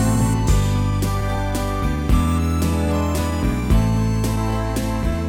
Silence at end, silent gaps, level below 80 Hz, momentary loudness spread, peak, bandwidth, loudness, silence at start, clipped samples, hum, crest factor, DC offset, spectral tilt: 0 s; none; -24 dBFS; 4 LU; -4 dBFS; 16.5 kHz; -20 LUFS; 0 s; under 0.1%; none; 14 dB; under 0.1%; -6.5 dB/octave